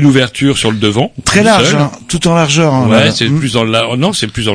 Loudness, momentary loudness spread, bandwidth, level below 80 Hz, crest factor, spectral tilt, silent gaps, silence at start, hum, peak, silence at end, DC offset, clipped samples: -10 LUFS; 6 LU; 11 kHz; -38 dBFS; 10 dB; -4.5 dB/octave; none; 0 s; none; 0 dBFS; 0 s; under 0.1%; 1%